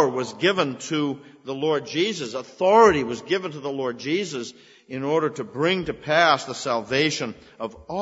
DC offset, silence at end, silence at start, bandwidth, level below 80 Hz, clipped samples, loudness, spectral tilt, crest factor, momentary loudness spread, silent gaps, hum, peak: under 0.1%; 0 s; 0 s; 8 kHz; -58 dBFS; under 0.1%; -23 LUFS; -4.5 dB/octave; 20 dB; 15 LU; none; none; -4 dBFS